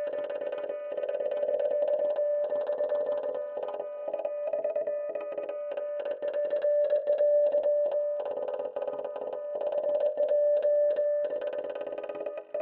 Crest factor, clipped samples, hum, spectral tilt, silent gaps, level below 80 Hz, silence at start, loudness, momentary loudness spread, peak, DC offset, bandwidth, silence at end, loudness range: 12 dB; under 0.1%; none; -7 dB/octave; none; -82 dBFS; 0 s; -30 LUFS; 10 LU; -16 dBFS; under 0.1%; 4.1 kHz; 0 s; 4 LU